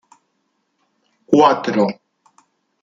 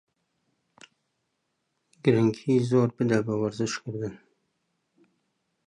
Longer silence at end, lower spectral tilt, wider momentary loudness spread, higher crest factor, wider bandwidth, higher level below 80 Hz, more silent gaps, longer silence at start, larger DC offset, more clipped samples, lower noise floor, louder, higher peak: second, 0.9 s vs 1.5 s; about the same, -6 dB/octave vs -7 dB/octave; about the same, 10 LU vs 11 LU; about the same, 18 dB vs 22 dB; second, 7.6 kHz vs 10.5 kHz; about the same, -64 dBFS vs -66 dBFS; neither; second, 1.3 s vs 2.05 s; neither; neither; second, -69 dBFS vs -78 dBFS; first, -16 LUFS vs -26 LUFS; first, -2 dBFS vs -6 dBFS